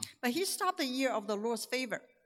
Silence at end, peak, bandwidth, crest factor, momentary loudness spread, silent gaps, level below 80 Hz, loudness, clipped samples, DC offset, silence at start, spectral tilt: 0.25 s; -14 dBFS; 17.5 kHz; 22 dB; 3 LU; none; -86 dBFS; -34 LUFS; under 0.1%; under 0.1%; 0 s; -2.5 dB/octave